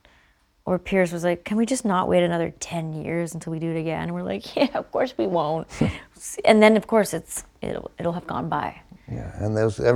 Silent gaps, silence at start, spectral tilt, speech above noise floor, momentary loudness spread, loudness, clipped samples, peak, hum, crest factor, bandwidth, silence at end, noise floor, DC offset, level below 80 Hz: none; 0.65 s; -5.5 dB/octave; 37 dB; 13 LU; -24 LUFS; under 0.1%; -2 dBFS; none; 22 dB; 16.5 kHz; 0 s; -61 dBFS; under 0.1%; -48 dBFS